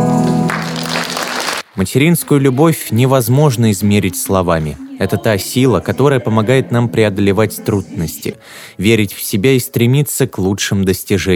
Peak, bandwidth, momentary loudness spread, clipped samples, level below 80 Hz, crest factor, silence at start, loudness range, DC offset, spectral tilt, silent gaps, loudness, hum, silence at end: 0 dBFS; 20 kHz; 7 LU; under 0.1%; -42 dBFS; 14 dB; 0 s; 2 LU; under 0.1%; -5.5 dB/octave; none; -14 LUFS; none; 0 s